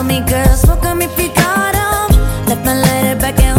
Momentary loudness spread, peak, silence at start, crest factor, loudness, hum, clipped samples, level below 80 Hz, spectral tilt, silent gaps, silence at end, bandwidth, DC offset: 3 LU; 0 dBFS; 0 s; 12 dB; -13 LUFS; none; under 0.1%; -16 dBFS; -5 dB/octave; none; 0 s; 17 kHz; under 0.1%